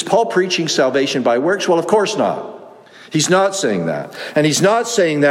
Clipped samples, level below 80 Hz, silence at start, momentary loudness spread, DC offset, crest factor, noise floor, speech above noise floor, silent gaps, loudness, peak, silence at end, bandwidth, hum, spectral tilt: under 0.1%; -64 dBFS; 0 s; 8 LU; under 0.1%; 14 dB; -40 dBFS; 24 dB; none; -16 LUFS; -2 dBFS; 0 s; 16 kHz; none; -4 dB/octave